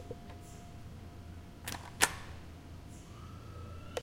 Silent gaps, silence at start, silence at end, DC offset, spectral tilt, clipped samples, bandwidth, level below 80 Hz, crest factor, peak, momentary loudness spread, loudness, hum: none; 0 s; 0 s; under 0.1%; -2.5 dB/octave; under 0.1%; 16.5 kHz; -56 dBFS; 36 dB; -6 dBFS; 19 LU; -40 LUFS; none